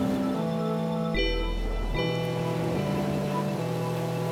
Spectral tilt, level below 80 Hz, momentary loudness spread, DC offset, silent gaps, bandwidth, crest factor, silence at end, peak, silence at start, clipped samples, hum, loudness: -6.5 dB/octave; -36 dBFS; 3 LU; under 0.1%; none; 16.5 kHz; 14 dB; 0 s; -14 dBFS; 0 s; under 0.1%; none; -29 LUFS